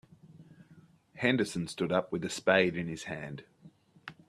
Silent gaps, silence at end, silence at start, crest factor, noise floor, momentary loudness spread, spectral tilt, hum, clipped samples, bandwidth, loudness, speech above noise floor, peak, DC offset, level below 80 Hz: none; 0.15 s; 0.25 s; 24 dB; -60 dBFS; 19 LU; -5 dB/octave; none; under 0.1%; 13.5 kHz; -31 LUFS; 29 dB; -10 dBFS; under 0.1%; -68 dBFS